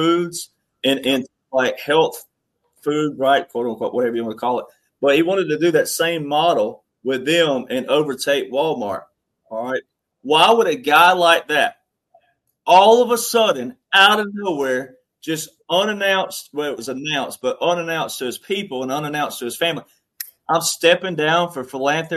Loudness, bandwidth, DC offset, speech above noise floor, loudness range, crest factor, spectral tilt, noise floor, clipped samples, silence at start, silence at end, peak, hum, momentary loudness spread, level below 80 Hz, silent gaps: -18 LUFS; 13.5 kHz; under 0.1%; 50 dB; 7 LU; 18 dB; -3 dB/octave; -68 dBFS; under 0.1%; 0 s; 0 s; 0 dBFS; none; 14 LU; -68 dBFS; none